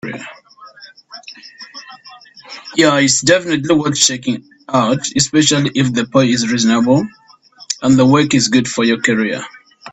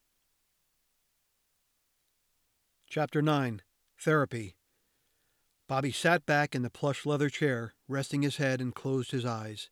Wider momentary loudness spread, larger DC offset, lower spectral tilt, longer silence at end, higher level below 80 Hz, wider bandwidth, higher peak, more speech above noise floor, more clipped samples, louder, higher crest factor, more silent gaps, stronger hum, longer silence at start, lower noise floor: first, 22 LU vs 9 LU; neither; second, -4 dB/octave vs -5.5 dB/octave; about the same, 0 s vs 0.05 s; first, -52 dBFS vs -74 dBFS; second, 8.8 kHz vs 15.5 kHz; first, 0 dBFS vs -12 dBFS; second, 30 dB vs 46 dB; neither; first, -13 LUFS vs -31 LUFS; about the same, 16 dB vs 20 dB; neither; neither; second, 0.05 s vs 2.9 s; second, -44 dBFS vs -77 dBFS